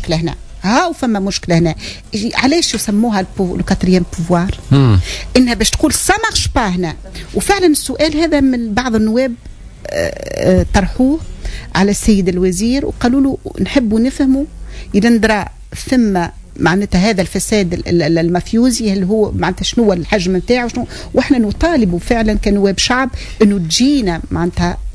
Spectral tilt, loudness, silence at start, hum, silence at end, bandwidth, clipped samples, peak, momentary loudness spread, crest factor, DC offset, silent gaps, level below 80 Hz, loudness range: -5 dB/octave; -14 LUFS; 0 s; none; 0 s; 11 kHz; under 0.1%; 0 dBFS; 8 LU; 14 dB; under 0.1%; none; -28 dBFS; 2 LU